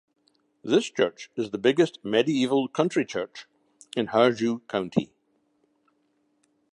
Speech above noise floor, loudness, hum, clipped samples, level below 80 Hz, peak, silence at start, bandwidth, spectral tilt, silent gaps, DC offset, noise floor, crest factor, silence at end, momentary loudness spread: 46 dB; -25 LUFS; none; under 0.1%; -70 dBFS; -6 dBFS; 0.65 s; 11 kHz; -5.5 dB/octave; none; under 0.1%; -70 dBFS; 22 dB; 1.65 s; 12 LU